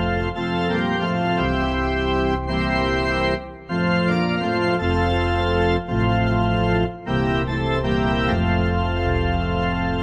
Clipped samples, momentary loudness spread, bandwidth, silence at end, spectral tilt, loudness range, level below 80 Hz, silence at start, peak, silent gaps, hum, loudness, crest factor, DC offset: under 0.1%; 3 LU; 8.8 kHz; 0 s; -7.5 dB/octave; 1 LU; -30 dBFS; 0 s; -6 dBFS; none; none; -21 LUFS; 14 dB; under 0.1%